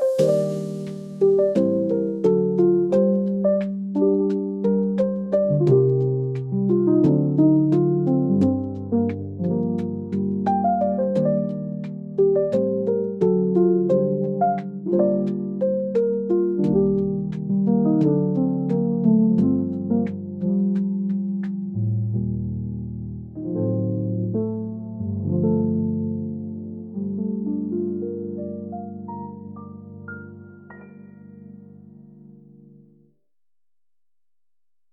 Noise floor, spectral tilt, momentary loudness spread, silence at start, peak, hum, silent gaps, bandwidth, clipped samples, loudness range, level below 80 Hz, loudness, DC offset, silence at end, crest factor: under -90 dBFS; -10.5 dB/octave; 13 LU; 0 s; -8 dBFS; none; none; 7.8 kHz; under 0.1%; 9 LU; -54 dBFS; -22 LUFS; under 0.1%; 2.55 s; 14 dB